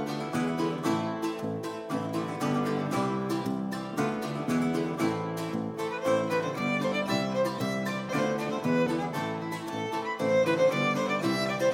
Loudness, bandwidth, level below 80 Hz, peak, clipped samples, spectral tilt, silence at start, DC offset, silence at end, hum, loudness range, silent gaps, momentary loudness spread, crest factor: -29 LUFS; 16.5 kHz; -66 dBFS; -14 dBFS; under 0.1%; -5.5 dB/octave; 0 s; under 0.1%; 0 s; none; 3 LU; none; 7 LU; 16 dB